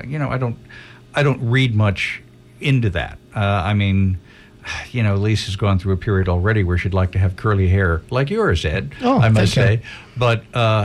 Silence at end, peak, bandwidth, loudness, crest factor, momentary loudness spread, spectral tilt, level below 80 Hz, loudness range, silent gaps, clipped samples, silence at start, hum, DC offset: 0 s; -4 dBFS; 11.5 kHz; -19 LUFS; 14 dB; 9 LU; -7 dB/octave; -36 dBFS; 3 LU; none; under 0.1%; 0 s; none; under 0.1%